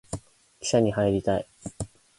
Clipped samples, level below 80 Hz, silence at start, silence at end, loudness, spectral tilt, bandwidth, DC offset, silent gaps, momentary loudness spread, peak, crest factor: under 0.1%; -50 dBFS; 0.1 s; 0.3 s; -25 LUFS; -5.5 dB/octave; 11.5 kHz; under 0.1%; none; 16 LU; -8 dBFS; 18 dB